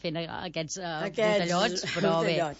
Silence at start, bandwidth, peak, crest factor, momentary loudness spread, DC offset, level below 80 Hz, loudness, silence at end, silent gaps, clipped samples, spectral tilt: 0.05 s; 8 kHz; -14 dBFS; 16 dB; 9 LU; under 0.1%; -62 dBFS; -28 LUFS; 0 s; none; under 0.1%; -4 dB/octave